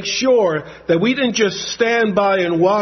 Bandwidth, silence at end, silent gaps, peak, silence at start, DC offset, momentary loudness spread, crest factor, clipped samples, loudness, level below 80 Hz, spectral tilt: 6.4 kHz; 0 s; none; -2 dBFS; 0 s; under 0.1%; 5 LU; 14 dB; under 0.1%; -16 LUFS; -54 dBFS; -4 dB/octave